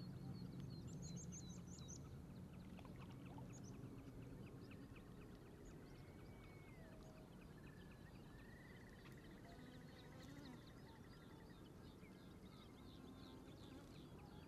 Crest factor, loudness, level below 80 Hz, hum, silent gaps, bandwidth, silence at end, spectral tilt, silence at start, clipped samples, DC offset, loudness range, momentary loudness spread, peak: 16 dB; -59 LUFS; -68 dBFS; none; none; 13 kHz; 0 s; -5.5 dB/octave; 0 s; under 0.1%; under 0.1%; 5 LU; 7 LU; -42 dBFS